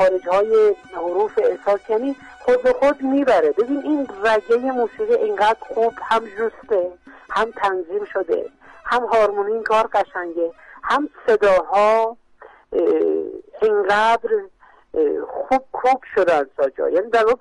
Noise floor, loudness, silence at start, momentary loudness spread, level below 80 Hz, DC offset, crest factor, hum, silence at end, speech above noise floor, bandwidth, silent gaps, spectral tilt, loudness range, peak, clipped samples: -43 dBFS; -19 LUFS; 0 s; 9 LU; -54 dBFS; under 0.1%; 12 dB; none; 0.05 s; 25 dB; 11 kHz; none; -4.5 dB/octave; 3 LU; -8 dBFS; under 0.1%